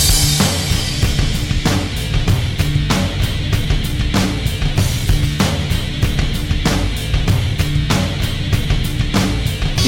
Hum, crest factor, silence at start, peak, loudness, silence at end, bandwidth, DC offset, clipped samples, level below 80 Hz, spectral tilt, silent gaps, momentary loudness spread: none; 14 dB; 0 s; -2 dBFS; -17 LUFS; 0 s; 17 kHz; under 0.1%; under 0.1%; -22 dBFS; -4.5 dB/octave; none; 3 LU